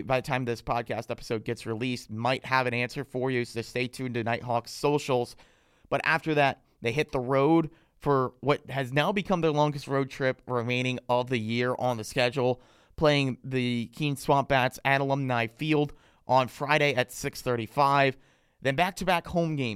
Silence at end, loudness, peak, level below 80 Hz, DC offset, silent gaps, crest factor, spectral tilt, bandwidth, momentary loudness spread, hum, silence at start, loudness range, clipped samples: 0 s; -28 LUFS; -8 dBFS; -56 dBFS; under 0.1%; none; 20 dB; -5.5 dB/octave; 16 kHz; 8 LU; none; 0 s; 3 LU; under 0.1%